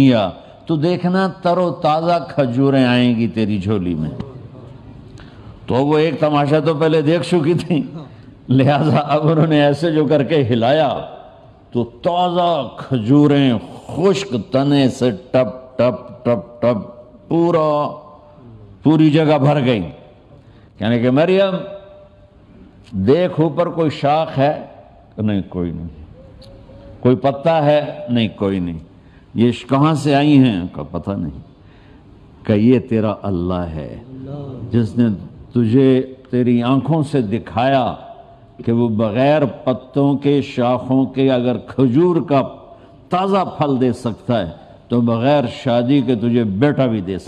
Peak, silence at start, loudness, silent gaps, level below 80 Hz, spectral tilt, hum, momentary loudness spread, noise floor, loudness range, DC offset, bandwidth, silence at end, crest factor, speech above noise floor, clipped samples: -2 dBFS; 0 s; -17 LUFS; none; -50 dBFS; -8 dB/octave; none; 13 LU; -45 dBFS; 4 LU; under 0.1%; 10 kHz; 0 s; 16 dB; 30 dB; under 0.1%